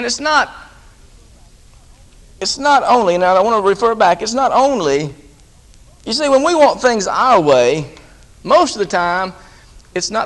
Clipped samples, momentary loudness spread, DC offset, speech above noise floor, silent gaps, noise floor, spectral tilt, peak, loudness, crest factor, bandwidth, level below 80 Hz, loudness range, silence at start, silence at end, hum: under 0.1%; 11 LU; under 0.1%; 31 dB; none; -44 dBFS; -3.5 dB/octave; 0 dBFS; -14 LUFS; 16 dB; 11.5 kHz; -46 dBFS; 3 LU; 0 s; 0 s; none